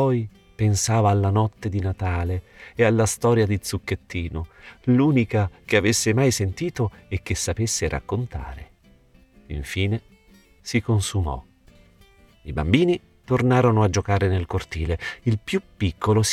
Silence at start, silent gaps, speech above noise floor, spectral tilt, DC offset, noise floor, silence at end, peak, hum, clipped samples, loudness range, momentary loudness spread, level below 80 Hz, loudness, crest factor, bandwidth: 0 s; none; 32 dB; -5.5 dB/octave; under 0.1%; -54 dBFS; 0 s; -4 dBFS; none; under 0.1%; 6 LU; 13 LU; -42 dBFS; -23 LUFS; 18 dB; 14.5 kHz